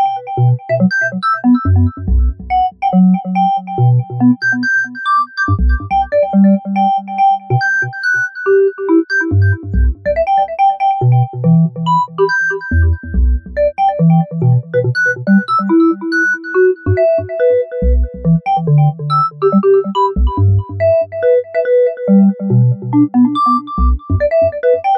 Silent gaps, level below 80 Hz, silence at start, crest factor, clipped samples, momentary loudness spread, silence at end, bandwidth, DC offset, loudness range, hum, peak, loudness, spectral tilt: none; -22 dBFS; 0 s; 12 dB; under 0.1%; 4 LU; 0 s; 6.6 kHz; under 0.1%; 1 LU; none; -2 dBFS; -13 LUFS; -8.5 dB/octave